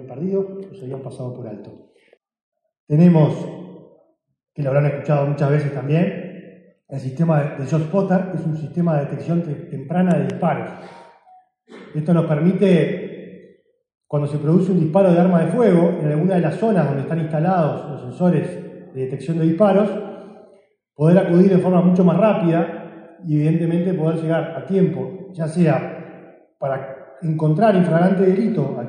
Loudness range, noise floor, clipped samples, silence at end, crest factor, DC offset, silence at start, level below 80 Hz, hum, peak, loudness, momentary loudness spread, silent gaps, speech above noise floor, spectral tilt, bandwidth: 5 LU; -59 dBFS; under 0.1%; 0 s; 18 dB; under 0.1%; 0 s; -64 dBFS; none; -2 dBFS; -18 LUFS; 17 LU; 2.42-2.52 s, 2.80-2.87 s; 42 dB; -9.5 dB/octave; 9.6 kHz